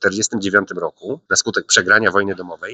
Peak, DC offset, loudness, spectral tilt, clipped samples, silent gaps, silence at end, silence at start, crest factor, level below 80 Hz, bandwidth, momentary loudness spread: 0 dBFS; under 0.1%; -16 LUFS; -2 dB/octave; under 0.1%; none; 0 s; 0 s; 18 dB; -62 dBFS; 10 kHz; 13 LU